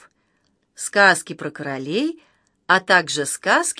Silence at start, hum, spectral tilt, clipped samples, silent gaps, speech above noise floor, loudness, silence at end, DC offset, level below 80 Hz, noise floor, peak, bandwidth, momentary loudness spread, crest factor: 0.8 s; none; -2.5 dB/octave; under 0.1%; none; 48 dB; -19 LUFS; 0.05 s; under 0.1%; -70 dBFS; -67 dBFS; 0 dBFS; 11 kHz; 14 LU; 20 dB